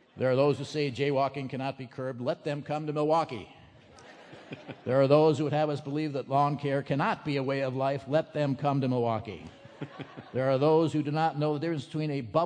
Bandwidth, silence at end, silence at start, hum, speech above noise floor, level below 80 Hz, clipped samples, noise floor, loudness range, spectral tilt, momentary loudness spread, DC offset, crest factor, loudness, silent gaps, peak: 9.8 kHz; 0 s; 0.15 s; none; 25 dB; -70 dBFS; under 0.1%; -53 dBFS; 4 LU; -7.5 dB/octave; 18 LU; under 0.1%; 20 dB; -29 LUFS; none; -8 dBFS